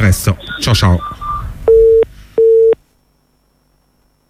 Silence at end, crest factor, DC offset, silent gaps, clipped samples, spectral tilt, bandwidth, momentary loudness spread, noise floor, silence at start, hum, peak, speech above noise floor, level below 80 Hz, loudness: 1.55 s; 12 dB; under 0.1%; none; under 0.1%; -5.5 dB/octave; 16 kHz; 12 LU; -57 dBFS; 0 s; none; 0 dBFS; 44 dB; -28 dBFS; -12 LUFS